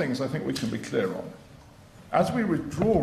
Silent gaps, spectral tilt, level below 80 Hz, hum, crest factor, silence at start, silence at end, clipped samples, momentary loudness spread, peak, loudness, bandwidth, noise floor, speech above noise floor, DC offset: none; -6.5 dB/octave; -54 dBFS; none; 20 dB; 0 s; 0 s; under 0.1%; 11 LU; -8 dBFS; -28 LUFS; 13.5 kHz; -50 dBFS; 24 dB; under 0.1%